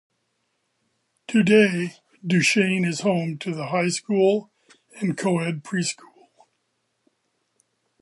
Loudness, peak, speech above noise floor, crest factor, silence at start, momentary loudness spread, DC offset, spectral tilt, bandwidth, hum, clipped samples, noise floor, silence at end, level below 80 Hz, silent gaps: -22 LUFS; -4 dBFS; 52 dB; 20 dB; 1.3 s; 12 LU; under 0.1%; -5 dB/octave; 11.5 kHz; none; under 0.1%; -74 dBFS; 2.1 s; -70 dBFS; none